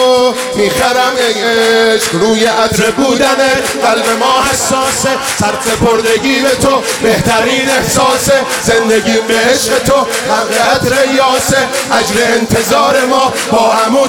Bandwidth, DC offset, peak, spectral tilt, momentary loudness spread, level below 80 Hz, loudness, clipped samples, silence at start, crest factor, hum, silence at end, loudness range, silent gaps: 17.5 kHz; under 0.1%; 0 dBFS; -3 dB/octave; 3 LU; -38 dBFS; -10 LUFS; under 0.1%; 0 s; 10 dB; none; 0 s; 1 LU; none